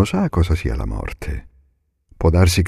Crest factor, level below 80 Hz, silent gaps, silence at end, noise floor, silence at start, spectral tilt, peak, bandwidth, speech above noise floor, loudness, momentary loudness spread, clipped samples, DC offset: 16 dB; -26 dBFS; none; 0 s; -62 dBFS; 0 s; -6 dB/octave; -2 dBFS; 14.5 kHz; 45 dB; -20 LUFS; 15 LU; under 0.1%; under 0.1%